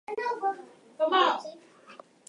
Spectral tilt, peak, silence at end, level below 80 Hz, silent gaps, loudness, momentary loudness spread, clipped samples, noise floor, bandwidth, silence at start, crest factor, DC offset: -2.5 dB/octave; -10 dBFS; 0.35 s; -88 dBFS; none; -28 LUFS; 16 LU; under 0.1%; -52 dBFS; 11 kHz; 0.1 s; 20 dB; under 0.1%